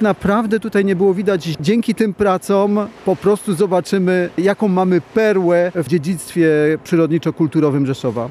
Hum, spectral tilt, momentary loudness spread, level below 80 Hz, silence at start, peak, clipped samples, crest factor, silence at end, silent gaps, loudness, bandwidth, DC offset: none; -7 dB/octave; 4 LU; -52 dBFS; 0 s; -4 dBFS; under 0.1%; 12 dB; 0 s; none; -16 LUFS; 14.5 kHz; under 0.1%